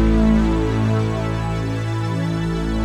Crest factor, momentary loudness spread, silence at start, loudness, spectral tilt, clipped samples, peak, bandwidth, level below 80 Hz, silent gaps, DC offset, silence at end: 12 dB; 7 LU; 0 s; -20 LUFS; -7.5 dB/octave; under 0.1%; -6 dBFS; 11 kHz; -26 dBFS; none; under 0.1%; 0 s